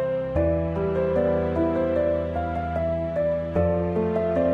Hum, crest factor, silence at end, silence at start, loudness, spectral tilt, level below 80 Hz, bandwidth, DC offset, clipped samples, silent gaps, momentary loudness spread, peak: none; 12 dB; 0 s; 0 s; -24 LUFS; -10 dB/octave; -38 dBFS; 5.4 kHz; under 0.1%; under 0.1%; none; 3 LU; -12 dBFS